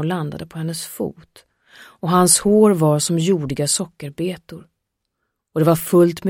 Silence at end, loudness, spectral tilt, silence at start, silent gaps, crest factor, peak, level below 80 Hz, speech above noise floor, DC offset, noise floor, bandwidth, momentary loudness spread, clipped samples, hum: 0 s; -18 LUFS; -5 dB/octave; 0 s; none; 18 dB; 0 dBFS; -54 dBFS; 58 dB; under 0.1%; -77 dBFS; 16.5 kHz; 15 LU; under 0.1%; none